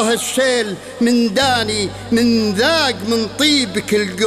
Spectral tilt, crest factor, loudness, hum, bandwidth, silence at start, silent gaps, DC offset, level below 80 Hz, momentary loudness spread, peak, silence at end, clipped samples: -3.5 dB/octave; 14 dB; -16 LUFS; none; 15 kHz; 0 s; none; under 0.1%; -46 dBFS; 5 LU; -2 dBFS; 0 s; under 0.1%